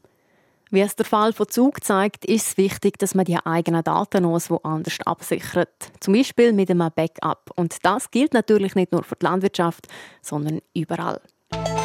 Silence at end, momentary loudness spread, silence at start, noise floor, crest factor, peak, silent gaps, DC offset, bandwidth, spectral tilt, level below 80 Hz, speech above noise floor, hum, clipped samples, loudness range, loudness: 0 s; 9 LU; 0.7 s; -62 dBFS; 18 dB; -4 dBFS; none; under 0.1%; 16.5 kHz; -5.5 dB/octave; -56 dBFS; 41 dB; none; under 0.1%; 2 LU; -21 LUFS